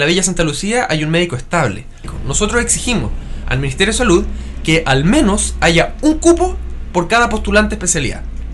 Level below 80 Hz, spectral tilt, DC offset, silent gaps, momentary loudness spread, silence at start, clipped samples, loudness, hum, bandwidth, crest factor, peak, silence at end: -24 dBFS; -4 dB/octave; under 0.1%; none; 10 LU; 0 s; under 0.1%; -14 LUFS; none; 12 kHz; 14 dB; -2 dBFS; 0 s